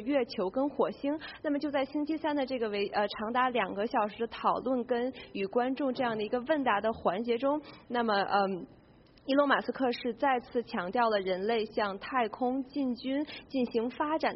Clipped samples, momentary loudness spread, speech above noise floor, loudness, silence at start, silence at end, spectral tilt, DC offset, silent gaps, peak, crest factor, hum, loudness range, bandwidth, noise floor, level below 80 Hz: under 0.1%; 6 LU; 28 dB; -31 LUFS; 0 s; 0 s; -3 dB/octave; under 0.1%; none; -12 dBFS; 18 dB; none; 1 LU; 5.8 kHz; -58 dBFS; -66 dBFS